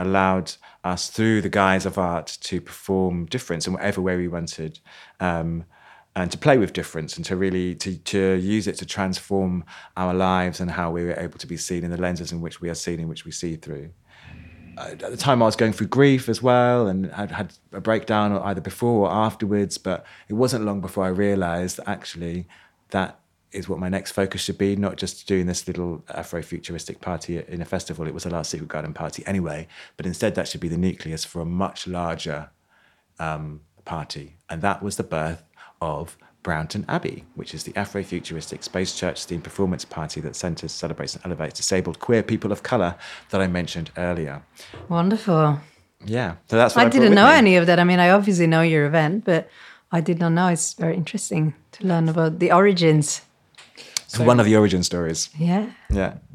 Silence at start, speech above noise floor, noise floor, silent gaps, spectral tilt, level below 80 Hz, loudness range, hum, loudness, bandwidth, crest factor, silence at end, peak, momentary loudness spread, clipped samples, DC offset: 0 s; 39 dB; -61 dBFS; none; -5.5 dB/octave; -46 dBFS; 12 LU; none; -22 LUFS; 14.5 kHz; 22 dB; 0.15 s; 0 dBFS; 15 LU; under 0.1%; under 0.1%